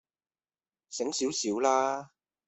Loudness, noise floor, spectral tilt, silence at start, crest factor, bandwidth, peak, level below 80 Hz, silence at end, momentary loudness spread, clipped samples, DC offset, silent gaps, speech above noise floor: -29 LUFS; under -90 dBFS; -2.5 dB/octave; 0.9 s; 20 dB; 8.4 kHz; -12 dBFS; -76 dBFS; 0.4 s; 11 LU; under 0.1%; under 0.1%; none; over 61 dB